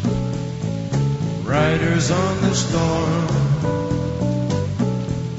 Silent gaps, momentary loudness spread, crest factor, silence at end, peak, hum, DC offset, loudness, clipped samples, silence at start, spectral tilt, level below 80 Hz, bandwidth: none; 6 LU; 14 dB; 0 s; -6 dBFS; none; under 0.1%; -20 LUFS; under 0.1%; 0 s; -6 dB/octave; -38 dBFS; 8 kHz